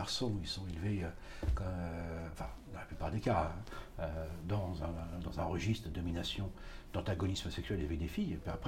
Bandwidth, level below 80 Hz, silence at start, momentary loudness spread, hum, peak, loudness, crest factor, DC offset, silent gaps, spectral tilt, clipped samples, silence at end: 16 kHz; -46 dBFS; 0 s; 9 LU; none; -20 dBFS; -40 LUFS; 20 dB; under 0.1%; none; -6 dB/octave; under 0.1%; 0 s